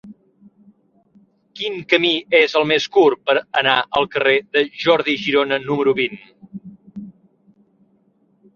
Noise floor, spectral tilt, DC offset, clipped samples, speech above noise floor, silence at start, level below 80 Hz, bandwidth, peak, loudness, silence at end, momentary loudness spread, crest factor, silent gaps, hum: -60 dBFS; -4.5 dB/octave; under 0.1%; under 0.1%; 42 dB; 0.05 s; -62 dBFS; 7 kHz; -2 dBFS; -17 LUFS; 1.45 s; 22 LU; 18 dB; none; none